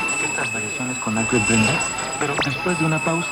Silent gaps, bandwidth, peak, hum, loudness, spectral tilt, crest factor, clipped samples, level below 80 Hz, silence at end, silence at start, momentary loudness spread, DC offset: none; 17 kHz; -6 dBFS; none; -20 LUFS; -3.5 dB/octave; 16 dB; under 0.1%; -48 dBFS; 0 s; 0 s; 6 LU; under 0.1%